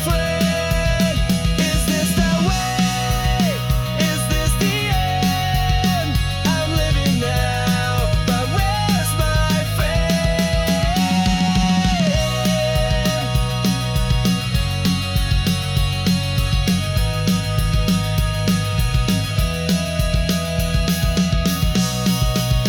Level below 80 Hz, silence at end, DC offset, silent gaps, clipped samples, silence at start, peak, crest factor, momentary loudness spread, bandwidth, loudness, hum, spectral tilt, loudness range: -24 dBFS; 0 s; under 0.1%; none; under 0.1%; 0 s; -6 dBFS; 12 dB; 2 LU; 18 kHz; -19 LUFS; none; -5 dB/octave; 2 LU